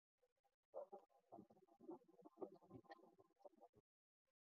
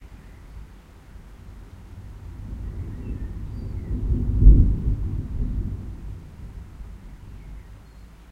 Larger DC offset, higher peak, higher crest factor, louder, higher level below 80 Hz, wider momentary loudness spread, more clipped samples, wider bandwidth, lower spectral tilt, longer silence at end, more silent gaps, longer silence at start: neither; second, -40 dBFS vs -2 dBFS; about the same, 24 dB vs 24 dB; second, -63 LUFS vs -25 LUFS; second, under -90 dBFS vs -26 dBFS; second, 8 LU vs 27 LU; neither; second, 2.1 kHz vs 2.9 kHz; second, -4 dB/octave vs -10 dB/octave; first, 0.6 s vs 0.1 s; first, 0.32-0.44 s, 0.54-0.73 s, 3.69-3.73 s vs none; first, 0.2 s vs 0 s